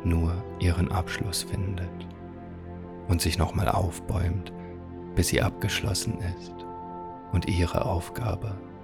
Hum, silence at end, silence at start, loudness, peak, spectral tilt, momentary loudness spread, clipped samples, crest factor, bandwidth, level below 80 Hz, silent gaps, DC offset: none; 0 s; 0 s; -29 LUFS; -6 dBFS; -5 dB/octave; 15 LU; under 0.1%; 22 dB; 18 kHz; -42 dBFS; none; under 0.1%